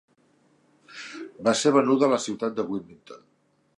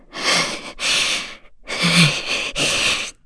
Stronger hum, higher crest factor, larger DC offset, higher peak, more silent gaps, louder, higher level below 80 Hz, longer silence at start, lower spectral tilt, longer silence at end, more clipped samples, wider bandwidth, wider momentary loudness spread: neither; about the same, 20 dB vs 18 dB; neither; second, -6 dBFS vs -2 dBFS; neither; second, -24 LUFS vs -17 LUFS; second, -72 dBFS vs -44 dBFS; first, 0.9 s vs 0.1 s; first, -4.5 dB/octave vs -2.5 dB/octave; first, 0.6 s vs 0.15 s; neither; about the same, 11.5 kHz vs 11 kHz; first, 21 LU vs 10 LU